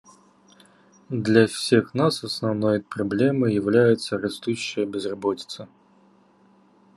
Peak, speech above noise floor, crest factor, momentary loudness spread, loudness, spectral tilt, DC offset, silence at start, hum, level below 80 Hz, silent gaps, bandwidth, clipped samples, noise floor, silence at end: -2 dBFS; 35 dB; 22 dB; 9 LU; -23 LUFS; -6 dB/octave; under 0.1%; 1.1 s; none; -68 dBFS; none; 12.5 kHz; under 0.1%; -57 dBFS; 1.3 s